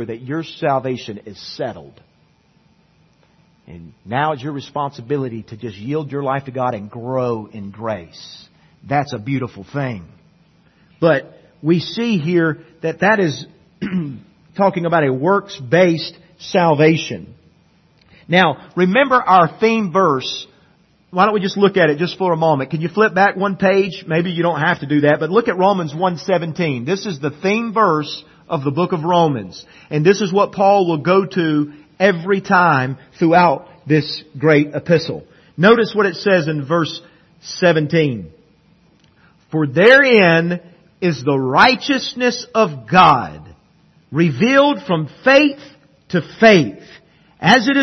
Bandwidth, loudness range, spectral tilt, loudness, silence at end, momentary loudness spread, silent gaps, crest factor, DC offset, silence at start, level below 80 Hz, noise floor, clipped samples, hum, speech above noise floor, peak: 6.4 kHz; 9 LU; -6 dB/octave; -16 LUFS; 0 s; 15 LU; none; 16 dB; under 0.1%; 0 s; -58 dBFS; -56 dBFS; under 0.1%; none; 40 dB; 0 dBFS